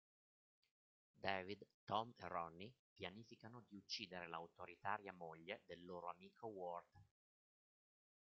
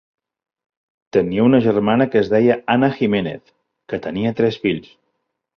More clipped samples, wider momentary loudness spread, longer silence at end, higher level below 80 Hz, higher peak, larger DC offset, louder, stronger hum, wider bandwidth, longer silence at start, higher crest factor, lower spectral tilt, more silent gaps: neither; about the same, 13 LU vs 13 LU; first, 1.25 s vs 0.75 s; second, -88 dBFS vs -54 dBFS; second, -26 dBFS vs -2 dBFS; neither; second, -52 LUFS vs -18 LUFS; neither; about the same, 7 kHz vs 6.4 kHz; about the same, 1.15 s vs 1.15 s; first, 28 dB vs 16 dB; second, -2 dB/octave vs -8.5 dB/octave; first, 1.74-1.87 s, 2.79-2.96 s vs none